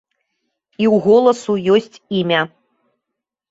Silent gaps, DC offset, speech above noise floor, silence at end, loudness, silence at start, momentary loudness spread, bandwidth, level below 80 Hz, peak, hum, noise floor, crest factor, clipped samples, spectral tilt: none; under 0.1%; 66 dB; 1.05 s; -16 LUFS; 0.8 s; 9 LU; 8 kHz; -62 dBFS; -2 dBFS; none; -81 dBFS; 16 dB; under 0.1%; -6 dB/octave